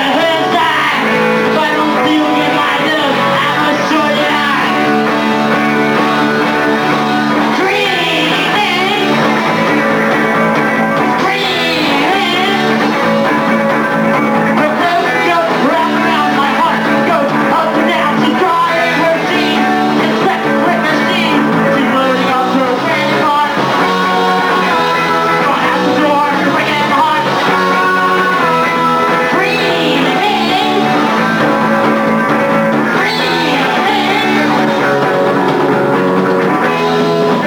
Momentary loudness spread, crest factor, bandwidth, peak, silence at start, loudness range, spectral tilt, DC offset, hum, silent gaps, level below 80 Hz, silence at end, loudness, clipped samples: 1 LU; 12 dB; 19 kHz; 0 dBFS; 0 s; 1 LU; -5 dB/octave; under 0.1%; none; none; -52 dBFS; 0 s; -11 LUFS; under 0.1%